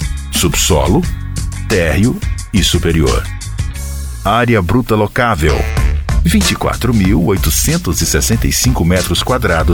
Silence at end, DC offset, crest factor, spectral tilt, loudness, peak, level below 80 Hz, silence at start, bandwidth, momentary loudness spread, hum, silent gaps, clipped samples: 0 s; 0.2%; 12 dB; -4.5 dB/octave; -13 LUFS; 0 dBFS; -20 dBFS; 0 s; 20 kHz; 10 LU; none; none; under 0.1%